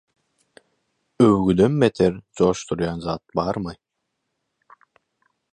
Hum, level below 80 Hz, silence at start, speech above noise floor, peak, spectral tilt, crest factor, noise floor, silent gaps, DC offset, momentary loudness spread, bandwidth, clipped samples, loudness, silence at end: none; -48 dBFS; 1.2 s; 58 dB; -2 dBFS; -7 dB/octave; 20 dB; -78 dBFS; none; under 0.1%; 10 LU; 11 kHz; under 0.1%; -21 LUFS; 1.8 s